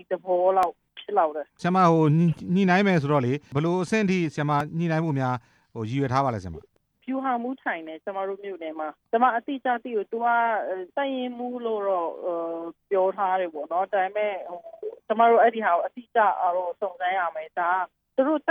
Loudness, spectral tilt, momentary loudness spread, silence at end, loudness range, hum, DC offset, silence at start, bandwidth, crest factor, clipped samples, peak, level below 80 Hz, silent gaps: -25 LUFS; -7.5 dB/octave; 13 LU; 0 s; 6 LU; none; under 0.1%; 0.1 s; 10.5 kHz; 18 dB; under 0.1%; -6 dBFS; -66 dBFS; none